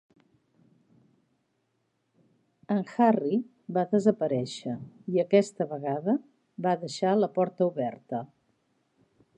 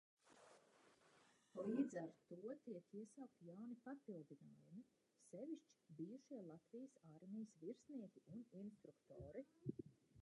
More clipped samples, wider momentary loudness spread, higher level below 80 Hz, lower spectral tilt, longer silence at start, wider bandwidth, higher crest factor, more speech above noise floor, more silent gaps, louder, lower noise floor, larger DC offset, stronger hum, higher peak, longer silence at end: neither; about the same, 13 LU vs 15 LU; first, -78 dBFS vs -86 dBFS; about the same, -7 dB/octave vs -7.5 dB/octave; first, 2.7 s vs 0.25 s; about the same, 10.5 kHz vs 11 kHz; about the same, 20 dB vs 24 dB; first, 49 dB vs 21 dB; neither; first, -28 LUFS vs -55 LUFS; about the same, -76 dBFS vs -76 dBFS; neither; neither; first, -8 dBFS vs -32 dBFS; first, 1.1 s vs 0 s